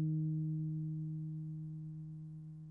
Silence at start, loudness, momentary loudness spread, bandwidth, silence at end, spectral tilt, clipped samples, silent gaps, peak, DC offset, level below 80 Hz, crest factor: 0 s; -42 LUFS; 12 LU; 1.1 kHz; 0 s; -13 dB/octave; under 0.1%; none; -30 dBFS; under 0.1%; -72 dBFS; 10 dB